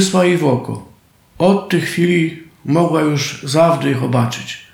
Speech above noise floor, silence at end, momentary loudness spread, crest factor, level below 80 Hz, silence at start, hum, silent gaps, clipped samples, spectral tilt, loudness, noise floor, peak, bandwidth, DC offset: 33 dB; 0.1 s; 9 LU; 14 dB; -56 dBFS; 0 s; none; none; under 0.1%; -5.5 dB/octave; -16 LUFS; -48 dBFS; -2 dBFS; 17 kHz; under 0.1%